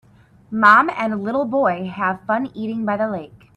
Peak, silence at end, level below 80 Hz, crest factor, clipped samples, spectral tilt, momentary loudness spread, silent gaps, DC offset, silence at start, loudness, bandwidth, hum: 0 dBFS; 0.2 s; -60 dBFS; 20 dB; under 0.1%; -7 dB/octave; 13 LU; none; under 0.1%; 0.5 s; -18 LUFS; 10.5 kHz; none